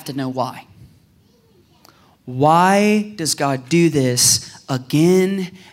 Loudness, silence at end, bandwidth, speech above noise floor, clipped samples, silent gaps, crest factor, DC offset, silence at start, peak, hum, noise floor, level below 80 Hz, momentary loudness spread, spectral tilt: -17 LUFS; 0.15 s; 16 kHz; 38 dB; under 0.1%; none; 16 dB; under 0.1%; 0.05 s; -2 dBFS; none; -54 dBFS; -60 dBFS; 13 LU; -4 dB/octave